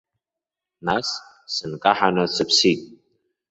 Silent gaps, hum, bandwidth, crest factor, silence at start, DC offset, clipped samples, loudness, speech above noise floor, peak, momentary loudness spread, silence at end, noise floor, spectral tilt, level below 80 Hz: none; none; 8.2 kHz; 22 dB; 0.85 s; under 0.1%; under 0.1%; -21 LUFS; 67 dB; -2 dBFS; 12 LU; 0.55 s; -88 dBFS; -3.5 dB/octave; -60 dBFS